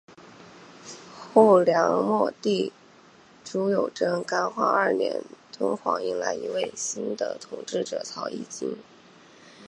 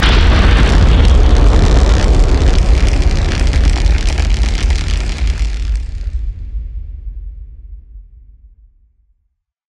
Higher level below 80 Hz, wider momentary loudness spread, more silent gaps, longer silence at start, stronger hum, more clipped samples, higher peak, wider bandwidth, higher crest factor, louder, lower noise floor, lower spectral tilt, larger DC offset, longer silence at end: second, -76 dBFS vs -12 dBFS; about the same, 18 LU vs 18 LU; neither; about the same, 0.1 s vs 0 s; neither; neither; about the same, -2 dBFS vs 0 dBFS; first, 11 kHz vs 9.8 kHz; first, 24 dB vs 12 dB; second, -25 LUFS vs -14 LUFS; second, -53 dBFS vs -66 dBFS; about the same, -4.5 dB/octave vs -5.5 dB/octave; neither; second, 0 s vs 1.7 s